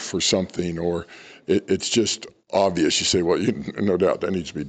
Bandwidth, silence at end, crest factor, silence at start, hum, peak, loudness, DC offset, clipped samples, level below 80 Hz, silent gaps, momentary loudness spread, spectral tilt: 9.4 kHz; 0 s; 14 dB; 0 s; none; -8 dBFS; -22 LUFS; under 0.1%; under 0.1%; -52 dBFS; none; 8 LU; -4 dB/octave